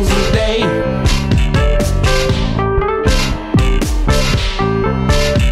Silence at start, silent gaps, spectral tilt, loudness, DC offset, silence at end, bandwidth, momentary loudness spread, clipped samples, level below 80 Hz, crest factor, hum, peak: 0 s; none; -5.5 dB/octave; -15 LUFS; under 0.1%; 0 s; 15 kHz; 2 LU; under 0.1%; -16 dBFS; 12 dB; none; -2 dBFS